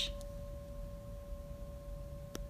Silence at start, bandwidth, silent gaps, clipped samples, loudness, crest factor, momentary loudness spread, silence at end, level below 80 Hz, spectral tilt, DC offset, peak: 0 s; 15.5 kHz; none; under 0.1%; -47 LUFS; 20 dB; 2 LU; 0 s; -48 dBFS; -4.5 dB/octave; under 0.1%; -24 dBFS